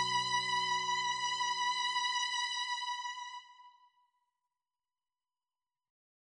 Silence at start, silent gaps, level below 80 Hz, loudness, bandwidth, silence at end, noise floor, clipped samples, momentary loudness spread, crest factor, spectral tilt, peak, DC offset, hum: 0 s; none; -88 dBFS; -33 LUFS; 9.6 kHz; 2.55 s; under -90 dBFS; under 0.1%; 10 LU; 18 dB; 0.5 dB/octave; -20 dBFS; under 0.1%; none